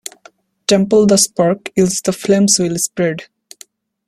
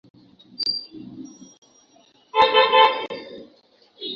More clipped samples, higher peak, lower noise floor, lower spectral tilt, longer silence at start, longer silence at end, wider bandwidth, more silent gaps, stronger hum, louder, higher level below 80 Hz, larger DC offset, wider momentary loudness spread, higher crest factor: neither; about the same, 0 dBFS vs -2 dBFS; second, -48 dBFS vs -57 dBFS; first, -4 dB/octave vs -2.5 dB/octave; about the same, 0.7 s vs 0.6 s; first, 0.85 s vs 0 s; first, 15.5 kHz vs 7.4 kHz; second, none vs 1.58-1.62 s; neither; first, -14 LUFS vs -19 LUFS; first, -52 dBFS vs -66 dBFS; neither; second, 9 LU vs 26 LU; about the same, 16 dB vs 20 dB